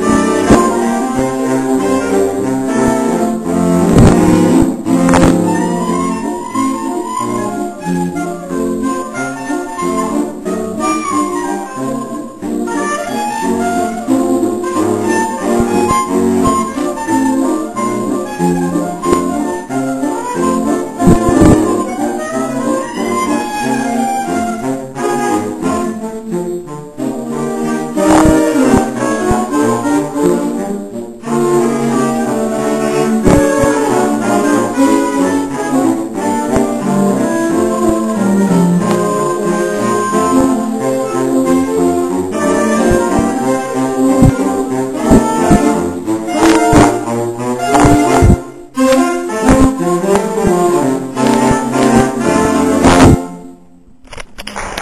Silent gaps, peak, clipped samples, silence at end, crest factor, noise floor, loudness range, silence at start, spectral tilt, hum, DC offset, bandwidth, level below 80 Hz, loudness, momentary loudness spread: none; 0 dBFS; 0.3%; 0 s; 12 dB; -42 dBFS; 6 LU; 0 s; -6 dB/octave; none; 0.7%; 14 kHz; -30 dBFS; -13 LUFS; 9 LU